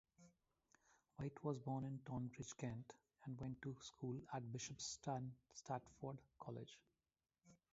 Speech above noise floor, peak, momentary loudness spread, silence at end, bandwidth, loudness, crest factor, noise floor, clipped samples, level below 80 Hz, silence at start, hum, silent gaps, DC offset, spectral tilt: over 40 dB; -30 dBFS; 10 LU; 0.2 s; 7.6 kHz; -51 LUFS; 20 dB; under -90 dBFS; under 0.1%; -76 dBFS; 0.2 s; none; none; under 0.1%; -6 dB/octave